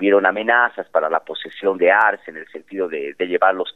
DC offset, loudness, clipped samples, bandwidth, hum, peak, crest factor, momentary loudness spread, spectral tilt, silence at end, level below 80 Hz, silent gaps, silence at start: 0.1%; -18 LUFS; under 0.1%; 4.1 kHz; none; -2 dBFS; 16 dB; 15 LU; -6 dB/octave; 0.05 s; -76 dBFS; none; 0 s